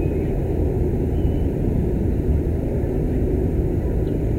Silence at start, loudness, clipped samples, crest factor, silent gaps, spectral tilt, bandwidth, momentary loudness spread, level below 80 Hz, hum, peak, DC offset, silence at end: 0 s; -22 LUFS; under 0.1%; 12 dB; none; -10.5 dB/octave; 15.5 kHz; 2 LU; -24 dBFS; none; -8 dBFS; under 0.1%; 0 s